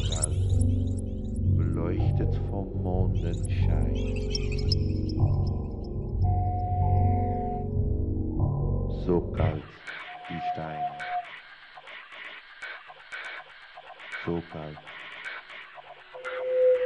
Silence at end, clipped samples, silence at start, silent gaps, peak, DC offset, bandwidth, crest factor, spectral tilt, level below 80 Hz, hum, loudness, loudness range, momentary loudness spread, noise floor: 0 s; under 0.1%; 0 s; none; -12 dBFS; under 0.1%; 11 kHz; 16 dB; -6.5 dB/octave; -34 dBFS; none; -29 LUFS; 10 LU; 16 LU; -48 dBFS